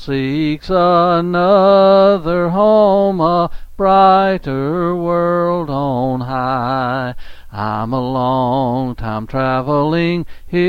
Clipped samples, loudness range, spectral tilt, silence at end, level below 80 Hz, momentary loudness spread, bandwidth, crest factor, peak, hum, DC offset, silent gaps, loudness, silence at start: under 0.1%; 7 LU; -8.5 dB/octave; 0 s; -36 dBFS; 12 LU; 6.8 kHz; 14 dB; 0 dBFS; none; under 0.1%; none; -14 LUFS; 0 s